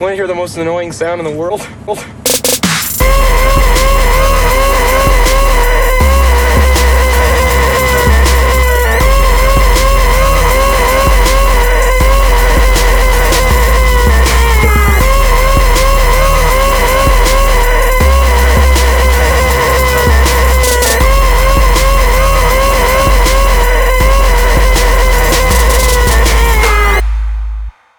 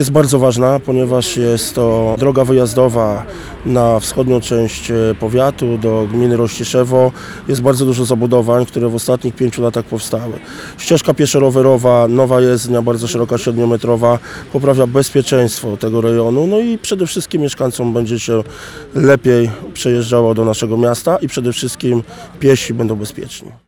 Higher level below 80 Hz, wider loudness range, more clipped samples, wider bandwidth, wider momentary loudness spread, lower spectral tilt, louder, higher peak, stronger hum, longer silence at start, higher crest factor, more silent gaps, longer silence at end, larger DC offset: first, -10 dBFS vs -42 dBFS; about the same, 1 LU vs 3 LU; neither; about the same, over 20 kHz vs 19 kHz; second, 3 LU vs 8 LU; second, -4 dB/octave vs -6 dB/octave; first, -9 LUFS vs -14 LUFS; about the same, 0 dBFS vs 0 dBFS; neither; about the same, 0 s vs 0 s; about the same, 8 dB vs 12 dB; neither; first, 0.3 s vs 0.15 s; first, 0.6% vs under 0.1%